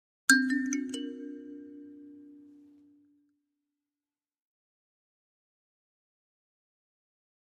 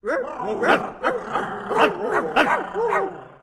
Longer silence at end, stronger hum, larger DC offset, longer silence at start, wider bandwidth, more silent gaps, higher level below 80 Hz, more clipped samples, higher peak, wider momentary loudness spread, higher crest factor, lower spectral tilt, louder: first, 5.05 s vs 0.1 s; neither; neither; first, 0.3 s vs 0.05 s; second, 13 kHz vs 15 kHz; neither; second, -86 dBFS vs -56 dBFS; neither; about the same, -6 dBFS vs -4 dBFS; first, 26 LU vs 7 LU; first, 32 dB vs 20 dB; second, -0.5 dB/octave vs -4.5 dB/octave; second, -28 LUFS vs -22 LUFS